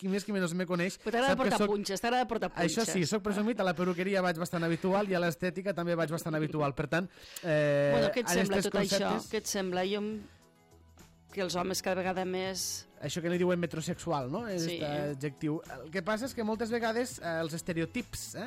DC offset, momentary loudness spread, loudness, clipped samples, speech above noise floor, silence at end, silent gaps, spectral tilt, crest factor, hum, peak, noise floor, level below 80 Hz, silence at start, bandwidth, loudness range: under 0.1%; 8 LU; -32 LUFS; under 0.1%; 29 dB; 0 s; none; -4.5 dB/octave; 16 dB; none; -16 dBFS; -61 dBFS; -60 dBFS; 0 s; 16 kHz; 5 LU